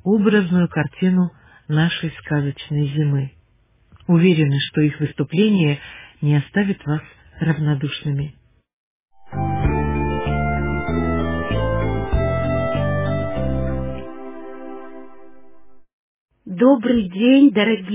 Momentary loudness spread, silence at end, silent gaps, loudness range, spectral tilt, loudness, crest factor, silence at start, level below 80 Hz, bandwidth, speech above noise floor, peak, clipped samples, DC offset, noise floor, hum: 16 LU; 0 s; 8.73-9.08 s, 15.93-16.26 s; 6 LU; -11.5 dB/octave; -19 LUFS; 16 dB; 0 s; -34 dBFS; 3.8 kHz; 41 dB; -4 dBFS; under 0.1%; under 0.1%; -58 dBFS; none